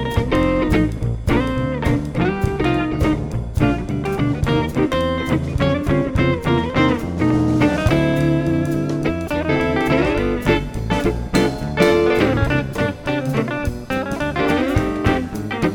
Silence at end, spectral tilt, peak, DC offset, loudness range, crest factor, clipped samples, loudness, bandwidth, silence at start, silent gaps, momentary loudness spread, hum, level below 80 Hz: 0 s; -7 dB/octave; -2 dBFS; under 0.1%; 2 LU; 16 dB; under 0.1%; -19 LUFS; 18.5 kHz; 0 s; none; 6 LU; none; -30 dBFS